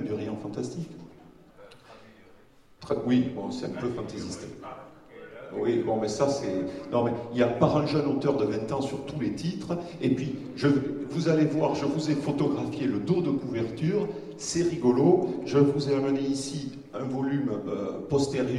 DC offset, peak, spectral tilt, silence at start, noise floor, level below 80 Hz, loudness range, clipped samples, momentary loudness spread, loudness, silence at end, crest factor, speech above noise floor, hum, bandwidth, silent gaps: under 0.1%; -8 dBFS; -6.5 dB/octave; 0 s; -56 dBFS; -60 dBFS; 7 LU; under 0.1%; 12 LU; -28 LUFS; 0 s; 20 dB; 29 dB; none; 11.5 kHz; none